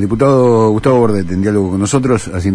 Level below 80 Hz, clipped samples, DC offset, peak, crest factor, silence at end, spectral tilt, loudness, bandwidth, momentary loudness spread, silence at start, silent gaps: -36 dBFS; under 0.1%; under 0.1%; 0 dBFS; 12 dB; 0 s; -7 dB/octave; -12 LUFS; 11 kHz; 6 LU; 0 s; none